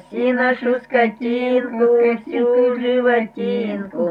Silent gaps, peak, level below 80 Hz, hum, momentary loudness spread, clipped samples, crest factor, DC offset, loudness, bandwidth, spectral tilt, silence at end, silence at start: none; -4 dBFS; -64 dBFS; none; 6 LU; under 0.1%; 14 dB; under 0.1%; -18 LUFS; 4.9 kHz; -7.5 dB/octave; 0 s; 0.1 s